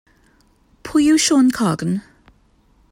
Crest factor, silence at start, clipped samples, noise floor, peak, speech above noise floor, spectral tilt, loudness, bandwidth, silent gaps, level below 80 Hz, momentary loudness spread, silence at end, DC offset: 14 dB; 0.85 s; under 0.1%; -56 dBFS; -6 dBFS; 41 dB; -4 dB/octave; -17 LUFS; 16 kHz; none; -52 dBFS; 12 LU; 0.9 s; under 0.1%